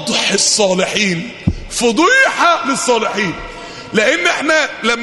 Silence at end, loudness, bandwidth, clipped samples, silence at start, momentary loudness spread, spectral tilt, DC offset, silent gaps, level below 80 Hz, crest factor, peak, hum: 0 s; -13 LUFS; 12 kHz; under 0.1%; 0 s; 10 LU; -2.5 dB/octave; under 0.1%; none; -38 dBFS; 14 dB; 0 dBFS; none